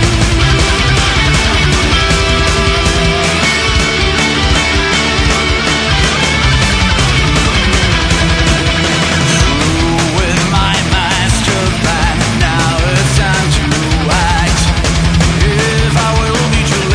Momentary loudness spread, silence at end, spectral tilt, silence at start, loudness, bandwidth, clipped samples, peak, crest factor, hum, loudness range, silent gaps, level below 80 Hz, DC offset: 2 LU; 0 s; -4 dB/octave; 0 s; -11 LUFS; 10.5 kHz; under 0.1%; 0 dBFS; 10 dB; none; 1 LU; none; -18 dBFS; under 0.1%